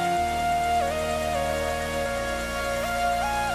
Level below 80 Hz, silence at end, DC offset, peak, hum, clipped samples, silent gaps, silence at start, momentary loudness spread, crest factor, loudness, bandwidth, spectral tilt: -40 dBFS; 0 s; under 0.1%; -14 dBFS; none; under 0.1%; none; 0 s; 3 LU; 10 dB; -26 LUFS; 16 kHz; -4 dB/octave